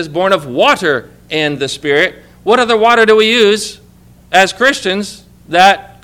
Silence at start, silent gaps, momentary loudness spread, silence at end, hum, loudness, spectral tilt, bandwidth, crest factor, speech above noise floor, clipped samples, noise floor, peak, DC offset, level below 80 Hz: 0 s; none; 11 LU; 0.2 s; 60 Hz at -45 dBFS; -11 LUFS; -3.5 dB/octave; 16.5 kHz; 12 dB; 31 dB; 0.7%; -42 dBFS; 0 dBFS; under 0.1%; -48 dBFS